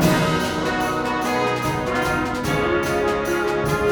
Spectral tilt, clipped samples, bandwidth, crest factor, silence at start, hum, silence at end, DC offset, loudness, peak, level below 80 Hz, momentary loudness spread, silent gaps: -5 dB/octave; under 0.1%; over 20 kHz; 16 dB; 0 s; none; 0 s; under 0.1%; -21 LUFS; -4 dBFS; -40 dBFS; 2 LU; none